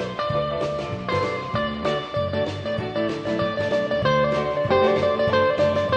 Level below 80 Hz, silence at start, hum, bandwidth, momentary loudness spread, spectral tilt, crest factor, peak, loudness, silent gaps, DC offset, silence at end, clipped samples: -48 dBFS; 0 s; none; 9.2 kHz; 6 LU; -6.5 dB/octave; 16 dB; -6 dBFS; -23 LUFS; none; under 0.1%; 0 s; under 0.1%